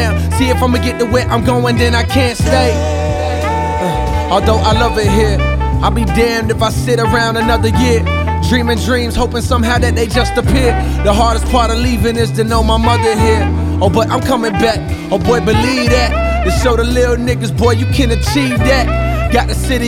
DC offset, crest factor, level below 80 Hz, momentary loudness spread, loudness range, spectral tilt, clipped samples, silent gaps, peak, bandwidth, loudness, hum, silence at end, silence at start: under 0.1%; 12 dB; -18 dBFS; 4 LU; 1 LU; -5.5 dB/octave; under 0.1%; none; 0 dBFS; 16 kHz; -13 LUFS; none; 0 s; 0 s